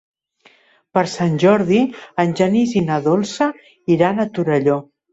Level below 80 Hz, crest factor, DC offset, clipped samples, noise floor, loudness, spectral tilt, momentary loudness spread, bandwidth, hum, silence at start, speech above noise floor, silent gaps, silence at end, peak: -56 dBFS; 16 dB; under 0.1%; under 0.1%; -54 dBFS; -17 LUFS; -6.5 dB/octave; 7 LU; 8.2 kHz; none; 0.95 s; 37 dB; none; 0.3 s; -2 dBFS